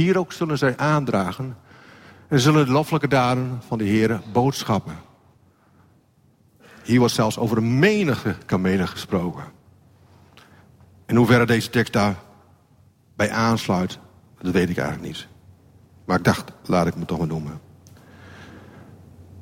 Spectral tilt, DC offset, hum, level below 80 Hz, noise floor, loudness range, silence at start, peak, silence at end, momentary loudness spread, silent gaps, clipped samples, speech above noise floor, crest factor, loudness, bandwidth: -6 dB/octave; under 0.1%; none; -52 dBFS; -58 dBFS; 5 LU; 0 s; -4 dBFS; 0 s; 17 LU; none; under 0.1%; 38 dB; 20 dB; -21 LUFS; 16.5 kHz